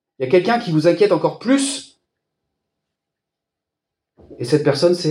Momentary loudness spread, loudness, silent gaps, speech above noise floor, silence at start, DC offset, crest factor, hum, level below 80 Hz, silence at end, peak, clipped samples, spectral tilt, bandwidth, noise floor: 7 LU; -17 LUFS; none; 67 dB; 0.2 s; under 0.1%; 18 dB; none; -66 dBFS; 0 s; -2 dBFS; under 0.1%; -5.5 dB/octave; 12 kHz; -83 dBFS